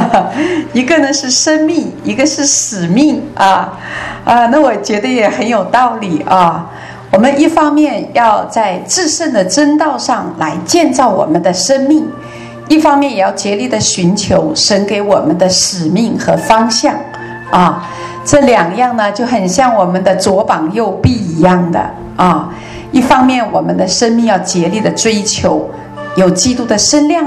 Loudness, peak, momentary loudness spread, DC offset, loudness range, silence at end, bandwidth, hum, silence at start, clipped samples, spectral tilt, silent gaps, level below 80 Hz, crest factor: -11 LUFS; 0 dBFS; 8 LU; under 0.1%; 1 LU; 0 s; 13 kHz; none; 0 s; 0.5%; -4 dB/octave; none; -40 dBFS; 10 dB